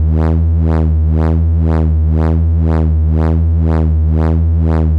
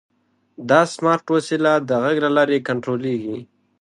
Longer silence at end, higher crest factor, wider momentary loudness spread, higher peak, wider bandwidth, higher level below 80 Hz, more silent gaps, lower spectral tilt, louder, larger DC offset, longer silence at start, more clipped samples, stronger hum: second, 0 s vs 0.35 s; second, 4 dB vs 18 dB; second, 0 LU vs 9 LU; second, -6 dBFS vs -2 dBFS; second, 2.8 kHz vs 11.5 kHz; first, -18 dBFS vs -68 dBFS; neither; first, -11 dB/octave vs -5.5 dB/octave; first, -13 LUFS vs -19 LUFS; neither; second, 0 s vs 0.6 s; neither; neither